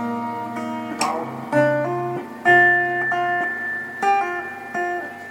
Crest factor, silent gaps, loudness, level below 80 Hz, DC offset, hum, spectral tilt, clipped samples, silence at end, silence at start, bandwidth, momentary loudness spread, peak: 18 dB; none; -21 LUFS; -74 dBFS; under 0.1%; none; -5 dB/octave; under 0.1%; 0 s; 0 s; 17 kHz; 13 LU; -4 dBFS